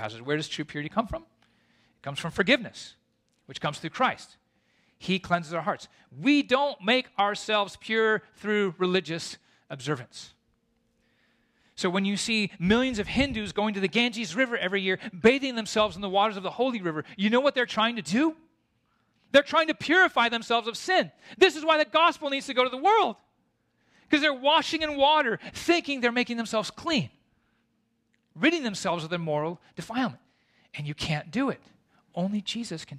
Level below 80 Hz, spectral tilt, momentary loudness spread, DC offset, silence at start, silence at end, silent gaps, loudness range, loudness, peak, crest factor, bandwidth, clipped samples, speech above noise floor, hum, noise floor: -58 dBFS; -4.5 dB/octave; 12 LU; under 0.1%; 0 s; 0 s; none; 7 LU; -26 LUFS; -8 dBFS; 20 dB; 14 kHz; under 0.1%; 46 dB; none; -73 dBFS